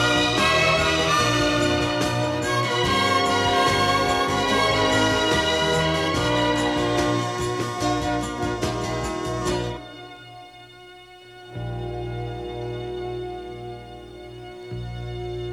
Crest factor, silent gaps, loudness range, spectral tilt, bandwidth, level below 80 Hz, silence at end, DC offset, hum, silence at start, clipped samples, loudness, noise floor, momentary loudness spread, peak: 18 dB; none; 13 LU; -4 dB/octave; 15.5 kHz; -42 dBFS; 0 s; under 0.1%; 60 Hz at -50 dBFS; 0 s; under 0.1%; -22 LUFS; -45 dBFS; 18 LU; -6 dBFS